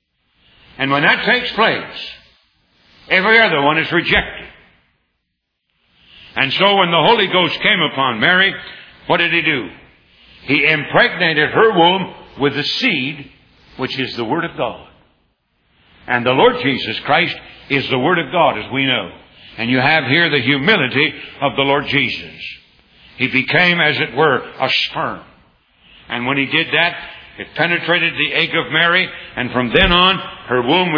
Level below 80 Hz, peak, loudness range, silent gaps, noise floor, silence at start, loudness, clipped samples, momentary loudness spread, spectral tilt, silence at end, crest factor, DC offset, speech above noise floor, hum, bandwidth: -42 dBFS; 0 dBFS; 5 LU; none; -73 dBFS; 0.8 s; -14 LUFS; under 0.1%; 14 LU; -6 dB/octave; 0 s; 18 dB; under 0.1%; 57 dB; none; 5.4 kHz